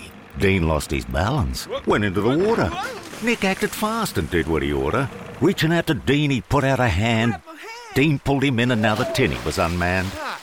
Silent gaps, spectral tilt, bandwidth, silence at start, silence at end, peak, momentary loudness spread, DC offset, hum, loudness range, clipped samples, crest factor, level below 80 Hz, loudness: none; -5.5 dB/octave; 17 kHz; 0 s; 0 s; -6 dBFS; 7 LU; under 0.1%; none; 2 LU; under 0.1%; 14 dB; -38 dBFS; -21 LUFS